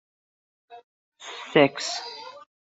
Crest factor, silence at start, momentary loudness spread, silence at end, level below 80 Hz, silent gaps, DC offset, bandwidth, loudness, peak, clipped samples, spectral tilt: 26 dB; 0.7 s; 22 LU; 0.4 s; -74 dBFS; 0.84-1.12 s; under 0.1%; 8.2 kHz; -23 LUFS; -4 dBFS; under 0.1%; -4 dB/octave